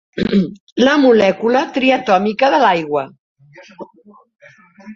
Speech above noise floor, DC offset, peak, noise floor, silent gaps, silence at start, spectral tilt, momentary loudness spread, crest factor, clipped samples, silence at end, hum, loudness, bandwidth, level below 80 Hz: 27 dB; under 0.1%; -2 dBFS; -41 dBFS; 0.60-0.76 s, 3.19-3.36 s; 0.15 s; -6 dB/octave; 11 LU; 14 dB; under 0.1%; 0 s; none; -14 LUFS; 7.4 kHz; -52 dBFS